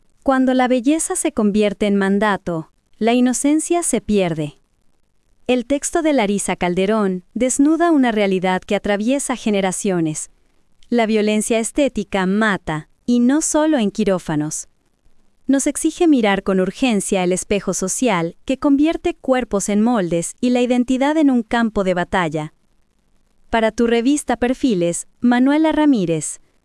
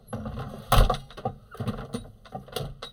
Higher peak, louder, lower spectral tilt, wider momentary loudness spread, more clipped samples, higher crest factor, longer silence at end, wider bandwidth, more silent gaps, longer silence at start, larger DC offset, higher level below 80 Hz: first, -2 dBFS vs -6 dBFS; first, -18 LUFS vs -30 LUFS; about the same, -4.5 dB/octave vs -5 dB/octave; second, 7 LU vs 16 LU; neither; second, 16 dB vs 24 dB; first, 0.3 s vs 0 s; second, 12 kHz vs 18 kHz; neither; first, 0.25 s vs 0.1 s; neither; second, -46 dBFS vs -32 dBFS